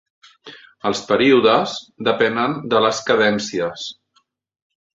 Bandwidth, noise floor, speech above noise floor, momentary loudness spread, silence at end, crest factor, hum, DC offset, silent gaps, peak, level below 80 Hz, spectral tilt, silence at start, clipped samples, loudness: 7.8 kHz; -64 dBFS; 46 dB; 12 LU; 1.05 s; 18 dB; none; under 0.1%; none; -2 dBFS; -60 dBFS; -4 dB/octave; 0.45 s; under 0.1%; -18 LUFS